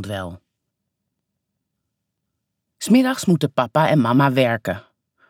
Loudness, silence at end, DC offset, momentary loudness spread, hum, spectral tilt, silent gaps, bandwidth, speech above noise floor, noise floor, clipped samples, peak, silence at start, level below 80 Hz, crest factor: -18 LUFS; 0.5 s; under 0.1%; 15 LU; none; -6 dB/octave; none; 16.5 kHz; 60 dB; -78 dBFS; under 0.1%; -4 dBFS; 0 s; -62 dBFS; 18 dB